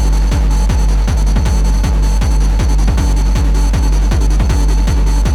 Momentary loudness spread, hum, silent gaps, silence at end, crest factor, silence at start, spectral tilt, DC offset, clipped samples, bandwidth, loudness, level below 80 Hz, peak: 1 LU; none; none; 0 s; 10 dB; 0 s; -6 dB/octave; under 0.1%; under 0.1%; 12 kHz; -14 LUFS; -10 dBFS; -2 dBFS